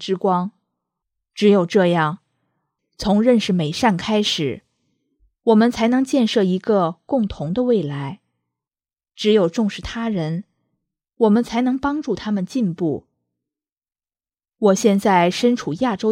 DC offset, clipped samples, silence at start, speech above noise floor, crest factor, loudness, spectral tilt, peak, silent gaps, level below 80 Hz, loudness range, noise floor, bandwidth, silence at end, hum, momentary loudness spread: under 0.1%; under 0.1%; 0 s; over 72 dB; 18 dB; -19 LUFS; -6 dB/octave; -2 dBFS; 13.72-13.81 s; -50 dBFS; 4 LU; under -90 dBFS; 14.5 kHz; 0 s; none; 10 LU